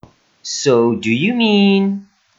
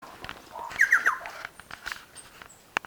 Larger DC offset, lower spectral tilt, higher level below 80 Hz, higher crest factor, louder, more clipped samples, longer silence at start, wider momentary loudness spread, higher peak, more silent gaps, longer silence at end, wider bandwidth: neither; first, -5 dB/octave vs -1 dB/octave; about the same, -62 dBFS vs -62 dBFS; second, 14 dB vs 24 dB; first, -15 LUFS vs -26 LUFS; neither; first, 0.45 s vs 0 s; second, 13 LU vs 25 LU; first, -2 dBFS vs -6 dBFS; neither; about the same, 0.35 s vs 0.3 s; second, 7.8 kHz vs over 20 kHz